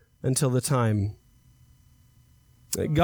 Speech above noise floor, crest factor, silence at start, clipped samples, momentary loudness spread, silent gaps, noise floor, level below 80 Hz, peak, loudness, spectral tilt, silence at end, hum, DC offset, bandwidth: 34 dB; 18 dB; 0.25 s; under 0.1%; 8 LU; none; -58 dBFS; -50 dBFS; -10 dBFS; -26 LUFS; -5.5 dB/octave; 0 s; none; under 0.1%; over 20 kHz